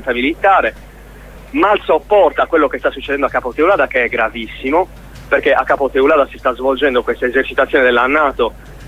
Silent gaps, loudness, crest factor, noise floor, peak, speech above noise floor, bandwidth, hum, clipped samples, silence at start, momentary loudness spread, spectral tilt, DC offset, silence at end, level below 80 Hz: none; -14 LUFS; 14 dB; -36 dBFS; 0 dBFS; 22 dB; 15.5 kHz; none; under 0.1%; 0 s; 7 LU; -5.5 dB/octave; under 0.1%; 0 s; -38 dBFS